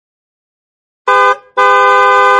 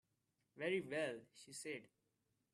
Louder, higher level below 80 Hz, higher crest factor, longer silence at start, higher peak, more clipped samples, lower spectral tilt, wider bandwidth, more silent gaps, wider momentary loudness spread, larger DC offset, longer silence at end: first, -9 LUFS vs -46 LUFS; first, -64 dBFS vs -90 dBFS; second, 10 dB vs 20 dB; first, 1.05 s vs 0.55 s; first, 0 dBFS vs -28 dBFS; first, 0.2% vs under 0.1%; second, -1.5 dB/octave vs -4 dB/octave; second, 11.5 kHz vs 13 kHz; neither; second, 5 LU vs 13 LU; neither; second, 0 s vs 0.65 s